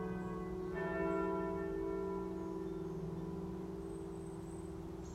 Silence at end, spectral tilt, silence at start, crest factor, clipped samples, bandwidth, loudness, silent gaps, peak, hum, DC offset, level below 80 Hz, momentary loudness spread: 0 s; -8 dB/octave; 0 s; 16 dB; under 0.1%; 13.5 kHz; -42 LUFS; none; -26 dBFS; none; under 0.1%; -56 dBFS; 9 LU